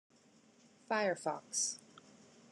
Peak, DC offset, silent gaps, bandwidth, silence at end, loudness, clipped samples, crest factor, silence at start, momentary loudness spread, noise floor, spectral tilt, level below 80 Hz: -22 dBFS; under 0.1%; none; 12 kHz; 0.4 s; -37 LUFS; under 0.1%; 20 dB; 0.9 s; 5 LU; -66 dBFS; -1.5 dB/octave; under -90 dBFS